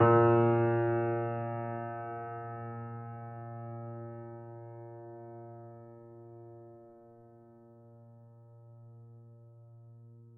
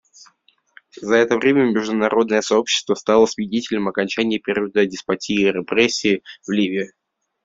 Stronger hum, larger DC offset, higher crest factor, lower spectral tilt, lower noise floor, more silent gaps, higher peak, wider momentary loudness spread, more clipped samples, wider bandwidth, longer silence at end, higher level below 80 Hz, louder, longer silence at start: neither; neither; first, 24 dB vs 18 dB; first, -12 dB/octave vs -4 dB/octave; about the same, -57 dBFS vs -58 dBFS; neither; second, -10 dBFS vs -2 dBFS; first, 28 LU vs 7 LU; neither; second, 3.1 kHz vs 7.8 kHz; second, 0 s vs 0.6 s; second, -80 dBFS vs -60 dBFS; second, -32 LUFS vs -19 LUFS; second, 0 s vs 0.95 s